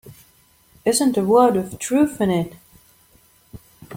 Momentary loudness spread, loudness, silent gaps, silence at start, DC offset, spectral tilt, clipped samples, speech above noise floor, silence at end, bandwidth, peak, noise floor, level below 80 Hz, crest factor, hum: 9 LU; -19 LUFS; none; 0.05 s; under 0.1%; -5 dB/octave; under 0.1%; 38 dB; 0 s; 16.5 kHz; -2 dBFS; -56 dBFS; -56 dBFS; 20 dB; none